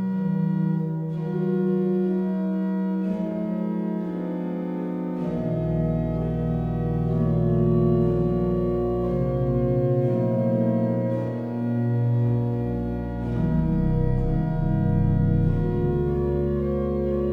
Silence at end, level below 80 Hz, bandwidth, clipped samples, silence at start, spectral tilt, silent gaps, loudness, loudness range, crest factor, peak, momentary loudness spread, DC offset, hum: 0 s; -34 dBFS; 4.5 kHz; under 0.1%; 0 s; -11.5 dB/octave; none; -24 LUFS; 4 LU; 14 dB; -10 dBFS; 6 LU; under 0.1%; none